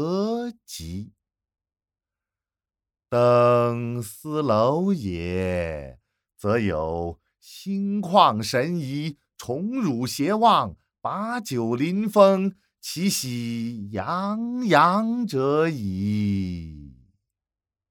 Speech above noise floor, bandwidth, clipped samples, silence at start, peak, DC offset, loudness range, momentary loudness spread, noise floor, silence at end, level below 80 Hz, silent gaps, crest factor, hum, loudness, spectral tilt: over 67 dB; 19 kHz; under 0.1%; 0 s; -2 dBFS; under 0.1%; 3 LU; 16 LU; under -90 dBFS; 1 s; -52 dBFS; none; 22 dB; none; -23 LUFS; -6 dB/octave